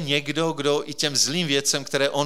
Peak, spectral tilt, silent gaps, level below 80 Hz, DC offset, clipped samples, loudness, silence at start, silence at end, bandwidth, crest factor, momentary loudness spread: -6 dBFS; -2.5 dB/octave; none; -72 dBFS; 0.7%; under 0.1%; -22 LUFS; 0 s; 0 s; 17 kHz; 18 dB; 4 LU